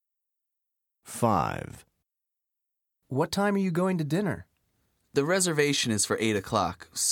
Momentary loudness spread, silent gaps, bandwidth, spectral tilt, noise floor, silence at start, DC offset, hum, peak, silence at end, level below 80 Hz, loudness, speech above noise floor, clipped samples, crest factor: 9 LU; none; 18 kHz; -4 dB/octave; -86 dBFS; 1.05 s; under 0.1%; none; -10 dBFS; 0 s; -60 dBFS; -27 LUFS; 60 dB; under 0.1%; 20 dB